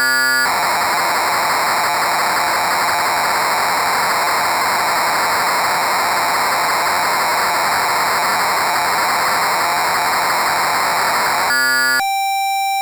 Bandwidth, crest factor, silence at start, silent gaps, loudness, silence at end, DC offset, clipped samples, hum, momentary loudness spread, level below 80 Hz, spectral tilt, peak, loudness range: over 20 kHz; 8 dB; 0 s; none; -15 LUFS; 0 s; under 0.1%; under 0.1%; none; 2 LU; -54 dBFS; -0.5 dB/octave; -8 dBFS; 0 LU